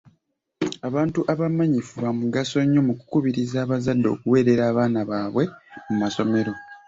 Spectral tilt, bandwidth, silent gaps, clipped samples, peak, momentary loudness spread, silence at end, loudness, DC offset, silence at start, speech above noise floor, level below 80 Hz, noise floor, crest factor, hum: -7 dB/octave; 7.8 kHz; none; under 0.1%; -6 dBFS; 9 LU; 0.1 s; -23 LUFS; under 0.1%; 0.6 s; 47 dB; -58 dBFS; -69 dBFS; 16 dB; none